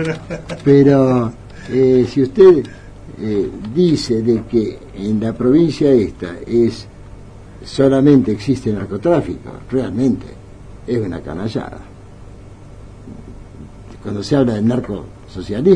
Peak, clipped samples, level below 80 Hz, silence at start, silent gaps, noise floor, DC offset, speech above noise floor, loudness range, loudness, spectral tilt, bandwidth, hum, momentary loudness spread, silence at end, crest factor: 0 dBFS; under 0.1%; -40 dBFS; 0 s; none; -36 dBFS; under 0.1%; 22 dB; 12 LU; -16 LUFS; -8 dB/octave; 10 kHz; none; 22 LU; 0 s; 16 dB